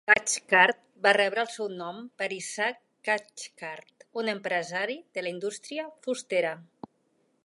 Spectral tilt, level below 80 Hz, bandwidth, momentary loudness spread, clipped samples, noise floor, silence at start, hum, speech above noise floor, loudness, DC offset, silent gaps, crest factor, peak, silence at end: -2 dB/octave; -76 dBFS; 11.5 kHz; 17 LU; under 0.1%; -71 dBFS; 0.05 s; none; 42 dB; -28 LUFS; under 0.1%; none; 24 dB; -6 dBFS; 0.8 s